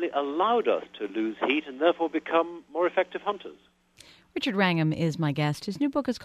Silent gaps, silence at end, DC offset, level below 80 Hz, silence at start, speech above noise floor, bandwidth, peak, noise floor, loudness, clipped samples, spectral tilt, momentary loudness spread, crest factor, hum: none; 0 s; under 0.1%; -66 dBFS; 0 s; 29 dB; 13.5 kHz; -8 dBFS; -55 dBFS; -27 LUFS; under 0.1%; -6.5 dB/octave; 8 LU; 20 dB; none